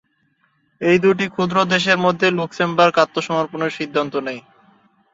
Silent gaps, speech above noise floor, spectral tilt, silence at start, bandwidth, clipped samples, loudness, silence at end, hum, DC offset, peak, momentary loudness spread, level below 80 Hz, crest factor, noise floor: none; 46 dB; -5 dB/octave; 0.8 s; 7.8 kHz; under 0.1%; -18 LUFS; 0.75 s; none; under 0.1%; -2 dBFS; 9 LU; -60 dBFS; 18 dB; -64 dBFS